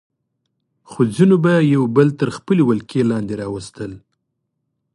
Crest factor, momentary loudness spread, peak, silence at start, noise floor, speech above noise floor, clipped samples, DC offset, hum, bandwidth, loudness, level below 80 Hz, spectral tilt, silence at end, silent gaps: 18 dB; 15 LU; 0 dBFS; 0.9 s; -74 dBFS; 58 dB; under 0.1%; under 0.1%; none; 11.5 kHz; -16 LUFS; -54 dBFS; -8 dB/octave; 0.95 s; none